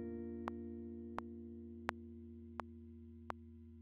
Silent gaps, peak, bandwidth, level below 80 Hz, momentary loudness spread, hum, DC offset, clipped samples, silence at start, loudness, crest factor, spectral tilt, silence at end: none; -16 dBFS; 3.7 kHz; -62 dBFS; 10 LU; 60 Hz at -85 dBFS; under 0.1%; under 0.1%; 0 s; -50 LUFS; 34 dB; -4 dB/octave; 0 s